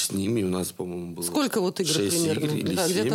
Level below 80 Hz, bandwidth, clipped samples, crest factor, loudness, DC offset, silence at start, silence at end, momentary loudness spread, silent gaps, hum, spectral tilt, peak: -68 dBFS; 17 kHz; under 0.1%; 14 dB; -26 LUFS; under 0.1%; 0 s; 0 s; 8 LU; none; none; -4 dB/octave; -12 dBFS